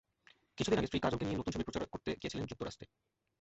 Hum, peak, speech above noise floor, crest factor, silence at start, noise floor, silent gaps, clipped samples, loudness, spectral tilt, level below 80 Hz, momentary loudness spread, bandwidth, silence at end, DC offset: none; -18 dBFS; 31 dB; 20 dB; 0.55 s; -69 dBFS; none; under 0.1%; -38 LUFS; -5 dB/octave; -56 dBFS; 15 LU; 8 kHz; 0.55 s; under 0.1%